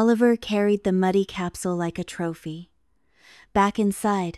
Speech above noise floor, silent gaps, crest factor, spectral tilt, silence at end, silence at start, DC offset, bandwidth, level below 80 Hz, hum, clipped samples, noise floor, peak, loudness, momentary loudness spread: 46 dB; none; 18 dB; -6 dB/octave; 0 s; 0 s; under 0.1%; 13 kHz; -54 dBFS; none; under 0.1%; -69 dBFS; -6 dBFS; -23 LUFS; 10 LU